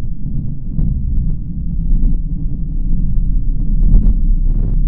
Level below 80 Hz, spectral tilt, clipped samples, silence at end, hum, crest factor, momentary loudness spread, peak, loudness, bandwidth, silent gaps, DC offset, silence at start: -14 dBFS; -14 dB/octave; under 0.1%; 0 s; none; 12 dB; 8 LU; 0 dBFS; -20 LUFS; 0.9 kHz; none; 4%; 0 s